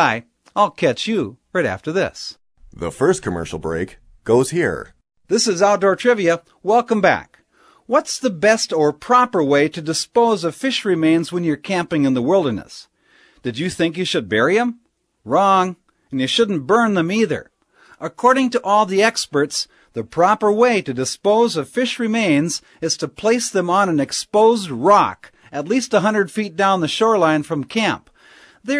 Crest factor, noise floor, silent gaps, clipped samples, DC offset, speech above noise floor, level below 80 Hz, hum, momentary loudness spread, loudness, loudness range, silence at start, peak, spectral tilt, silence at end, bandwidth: 18 dB; -54 dBFS; none; under 0.1%; under 0.1%; 37 dB; -54 dBFS; none; 10 LU; -18 LUFS; 4 LU; 0 s; 0 dBFS; -4.5 dB/octave; 0 s; 11 kHz